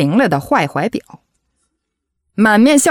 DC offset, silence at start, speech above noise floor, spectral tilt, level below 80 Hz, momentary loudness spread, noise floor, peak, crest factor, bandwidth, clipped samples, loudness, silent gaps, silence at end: under 0.1%; 0 s; 62 dB; -4.5 dB/octave; -54 dBFS; 15 LU; -74 dBFS; -2 dBFS; 12 dB; 16.5 kHz; under 0.1%; -13 LUFS; none; 0 s